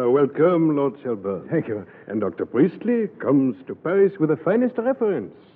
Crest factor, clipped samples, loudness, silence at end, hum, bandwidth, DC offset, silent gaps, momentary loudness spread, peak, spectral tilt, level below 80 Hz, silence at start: 16 dB; under 0.1%; -22 LUFS; 0.25 s; none; 4 kHz; under 0.1%; none; 10 LU; -6 dBFS; -12 dB/octave; -72 dBFS; 0 s